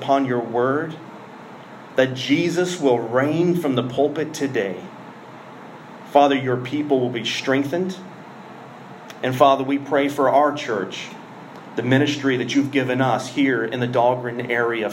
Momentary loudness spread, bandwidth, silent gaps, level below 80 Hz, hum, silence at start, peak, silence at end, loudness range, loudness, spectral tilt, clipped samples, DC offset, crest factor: 22 LU; 16 kHz; none; -72 dBFS; none; 0 s; -2 dBFS; 0 s; 2 LU; -20 LUFS; -5.5 dB/octave; under 0.1%; under 0.1%; 20 dB